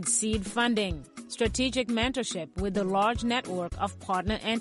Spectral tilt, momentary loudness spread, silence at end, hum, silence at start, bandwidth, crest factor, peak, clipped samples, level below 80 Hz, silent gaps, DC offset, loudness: -3.5 dB/octave; 7 LU; 0 s; none; 0 s; 11.5 kHz; 16 dB; -14 dBFS; under 0.1%; -44 dBFS; none; under 0.1%; -29 LUFS